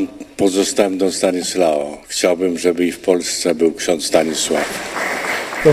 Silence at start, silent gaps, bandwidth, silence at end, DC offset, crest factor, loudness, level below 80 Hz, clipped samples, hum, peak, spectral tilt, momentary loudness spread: 0 s; none; 15.5 kHz; 0 s; under 0.1%; 16 dB; -17 LUFS; -52 dBFS; under 0.1%; none; 0 dBFS; -3.5 dB/octave; 5 LU